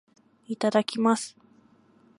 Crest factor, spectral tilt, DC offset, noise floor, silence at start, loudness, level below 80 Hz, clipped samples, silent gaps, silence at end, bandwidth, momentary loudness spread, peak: 20 dB; -4.5 dB/octave; under 0.1%; -60 dBFS; 0.5 s; -25 LUFS; -80 dBFS; under 0.1%; none; 0.9 s; 11.5 kHz; 14 LU; -8 dBFS